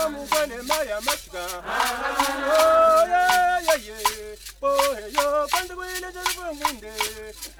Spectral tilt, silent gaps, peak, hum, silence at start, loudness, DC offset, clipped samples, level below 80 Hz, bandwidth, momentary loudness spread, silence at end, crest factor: -1 dB/octave; none; -6 dBFS; none; 0 s; -23 LUFS; under 0.1%; under 0.1%; -48 dBFS; 20 kHz; 13 LU; 0.05 s; 18 dB